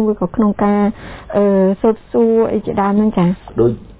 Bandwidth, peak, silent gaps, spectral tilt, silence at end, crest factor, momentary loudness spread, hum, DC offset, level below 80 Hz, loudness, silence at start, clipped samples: 4 kHz; -2 dBFS; none; -12.5 dB/octave; 0.1 s; 12 dB; 4 LU; none; under 0.1%; -40 dBFS; -15 LUFS; 0 s; under 0.1%